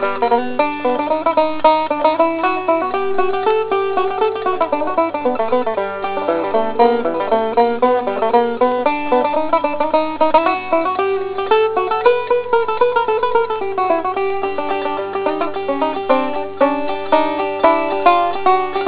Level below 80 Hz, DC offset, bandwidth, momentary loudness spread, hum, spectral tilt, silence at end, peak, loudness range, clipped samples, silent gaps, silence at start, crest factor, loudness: -56 dBFS; under 0.1%; 4 kHz; 5 LU; 50 Hz at -50 dBFS; -8.5 dB/octave; 0 s; 0 dBFS; 3 LU; under 0.1%; none; 0 s; 16 dB; -17 LUFS